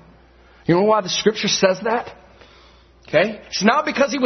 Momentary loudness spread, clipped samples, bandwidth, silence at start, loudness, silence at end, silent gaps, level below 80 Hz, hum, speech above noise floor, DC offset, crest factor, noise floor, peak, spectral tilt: 7 LU; under 0.1%; 6.4 kHz; 0.7 s; -19 LUFS; 0 s; none; -54 dBFS; none; 31 dB; under 0.1%; 18 dB; -50 dBFS; -2 dBFS; -4 dB/octave